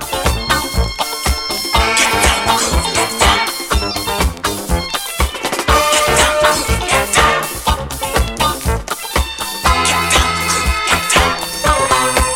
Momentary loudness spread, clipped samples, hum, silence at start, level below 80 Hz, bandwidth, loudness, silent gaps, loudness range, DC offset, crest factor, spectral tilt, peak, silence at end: 7 LU; under 0.1%; none; 0 s; -22 dBFS; 18.5 kHz; -14 LUFS; none; 2 LU; under 0.1%; 14 dB; -2.5 dB/octave; 0 dBFS; 0 s